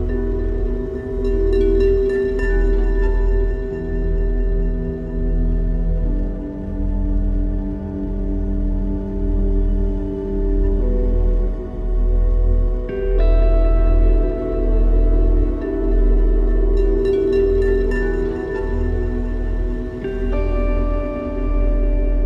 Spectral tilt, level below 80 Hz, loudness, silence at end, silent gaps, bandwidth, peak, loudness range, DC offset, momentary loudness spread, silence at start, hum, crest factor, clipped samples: -10 dB/octave; -18 dBFS; -21 LUFS; 0 s; none; 4.2 kHz; -6 dBFS; 4 LU; under 0.1%; 7 LU; 0 s; none; 12 dB; under 0.1%